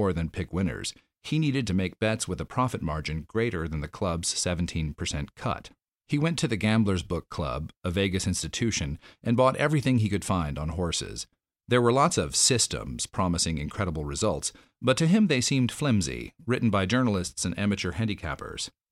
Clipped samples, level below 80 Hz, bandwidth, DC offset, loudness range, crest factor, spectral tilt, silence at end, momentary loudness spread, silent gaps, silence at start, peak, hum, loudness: under 0.1%; -44 dBFS; 15 kHz; under 0.1%; 4 LU; 18 dB; -4.5 dB/octave; 0.25 s; 11 LU; 7.77-7.81 s; 0 s; -10 dBFS; none; -27 LUFS